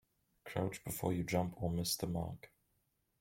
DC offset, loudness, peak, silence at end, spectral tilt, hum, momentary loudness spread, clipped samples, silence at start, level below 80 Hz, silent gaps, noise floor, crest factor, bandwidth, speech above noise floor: under 0.1%; -39 LUFS; -20 dBFS; 0.75 s; -5 dB/octave; none; 9 LU; under 0.1%; 0.45 s; -62 dBFS; none; -80 dBFS; 20 dB; 16.5 kHz; 42 dB